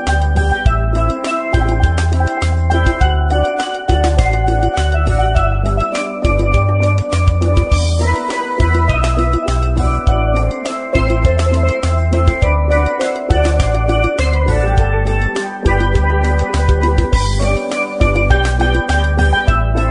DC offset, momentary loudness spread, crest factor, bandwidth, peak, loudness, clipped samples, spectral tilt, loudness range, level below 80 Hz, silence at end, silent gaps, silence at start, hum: under 0.1%; 3 LU; 14 dB; 10.5 kHz; 0 dBFS; -15 LUFS; under 0.1%; -6 dB/octave; 1 LU; -16 dBFS; 0 s; none; 0 s; none